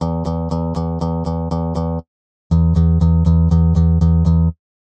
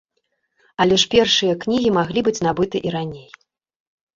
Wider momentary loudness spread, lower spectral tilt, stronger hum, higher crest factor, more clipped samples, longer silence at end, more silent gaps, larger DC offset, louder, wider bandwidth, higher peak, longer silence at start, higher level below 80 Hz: second, 7 LU vs 14 LU; first, -10.5 dB/octave vs -4 dB/octave; neither; second, 12 dB vs 18 dB; neither; second, 0.45 s vs 0.95 s; first, 2.08-2.50 s vs none; neither; about the same, -17 LUFS vs -18 LUFS; second, 6.6 kHz vs 7.8 kHz; about the same, -4 dBFS vs -2 dBFS; second, 0 s vs 0.8 s; first, -22 dBFS vs -50 dBFS